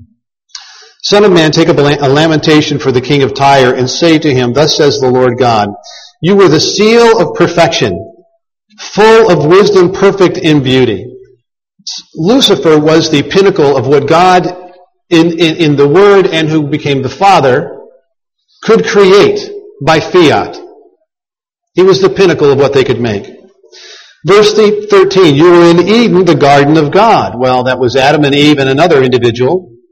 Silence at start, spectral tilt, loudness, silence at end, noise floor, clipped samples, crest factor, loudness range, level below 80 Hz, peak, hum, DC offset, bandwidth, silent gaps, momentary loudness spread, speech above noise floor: 0.55 s; -5.5 dB/octave; -7 LUFS; 0.25 s; -88 dBFS; 2%; 8 dB; 3 LU; -42 dBFS; 0 dBFS; none; under 0.1%; 12 kHz; none; 10 LU; 81 dB